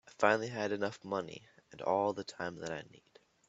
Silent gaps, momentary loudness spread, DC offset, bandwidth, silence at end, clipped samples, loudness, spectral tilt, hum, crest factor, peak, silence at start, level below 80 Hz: none; 15 LU; under 0.1%; 8.2 kHz; 0.5 s; under 0.1%; -36 LUFS; -5 dB/octave; none; 26 dB; -10 dBFS; 0.05 s; -76 dBFS